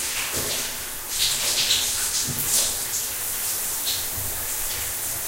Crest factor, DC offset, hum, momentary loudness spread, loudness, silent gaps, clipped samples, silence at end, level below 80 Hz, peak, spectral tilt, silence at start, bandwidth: 18 dB; under 0.1%; none; 6 LU; -22 LUFS; none; under 0.1%; 0 s; -46 dBFS; -6 dBFS; 0 dB/octave; 0 s; 16 kHz